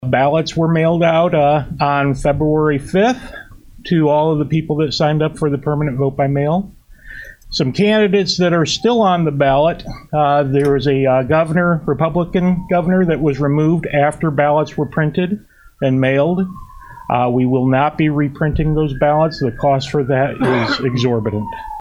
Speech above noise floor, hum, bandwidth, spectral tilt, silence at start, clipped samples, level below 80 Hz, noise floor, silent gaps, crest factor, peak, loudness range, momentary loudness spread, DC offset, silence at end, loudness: 20 dB; none; 11 kHz; -7 dB/octave; 0 s; under 0.1%; -38 dBFS; -35 dBFS; none; 16 dB; 0 dBFS; 3 LU; 7 LU; under 0.1%; 0 s; -16 LUFS